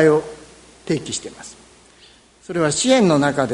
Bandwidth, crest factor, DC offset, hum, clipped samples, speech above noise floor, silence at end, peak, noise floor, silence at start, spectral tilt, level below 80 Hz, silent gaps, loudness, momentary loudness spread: 11 kHz; 18 dB; under 0.1%; none; under 0.1%; 32 dB; 0 s; -2 dBFS; -50 dBFS; 0 s; -4.5 dB/octave; -54 dBFS; none; -18 LUFS; 24 LU